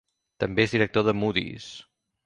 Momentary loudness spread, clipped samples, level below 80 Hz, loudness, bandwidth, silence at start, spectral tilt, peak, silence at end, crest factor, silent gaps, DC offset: 18 LU; under 0.1%; -54 dBFS; -25 LUFS; 10 kHz; 0.4 s; -6 dB/octave; -6 dBFS; 0.45 s; 20 dB; none; under 0.1%